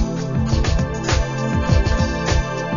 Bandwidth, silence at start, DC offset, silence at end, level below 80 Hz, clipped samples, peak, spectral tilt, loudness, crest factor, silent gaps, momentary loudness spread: 7.4 kHz; 0 s; 0.6%; 0 s; -24 dBFS; under 0.1%; -4 dBFS; -5.5 dB/octave; -20 LUFS; 16 dB; none; 3 LU